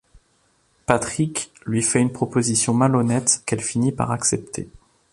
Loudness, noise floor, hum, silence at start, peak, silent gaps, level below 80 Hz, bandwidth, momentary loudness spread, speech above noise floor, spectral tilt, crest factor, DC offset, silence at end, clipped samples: -21 LUFS; -63 dBFS; none; 0.9 s; -2 dBFS; none; -52 dBFS; 11.5 kHz; 10 LU; 42 dB; -4.5 dB/octave; 20 dB; under 0.1%; 0.35 s; under 0.1%